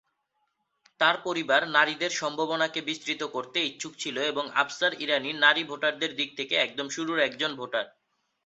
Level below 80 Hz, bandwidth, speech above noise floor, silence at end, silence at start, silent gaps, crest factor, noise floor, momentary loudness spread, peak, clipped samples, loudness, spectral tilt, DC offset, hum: -78 dBFS; 8.2 kHz; 49 dB; 0.55 s; 1 s; none; 22 dB; -77 dBFS; 10 LU; -6 dBFS; under 0.1%; -27 LUFS; -2 dB/octave; under 0.1%; none